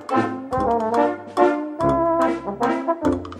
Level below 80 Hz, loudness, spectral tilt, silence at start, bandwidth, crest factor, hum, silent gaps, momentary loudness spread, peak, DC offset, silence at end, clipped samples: -46 dBFS; -21 LUFS; -7 dB/octave; 0 s; 11.5 kHz; 18 dB; none; none; 4 LU; -2 dBFS; under 0.1%; 0 s; under 0.1%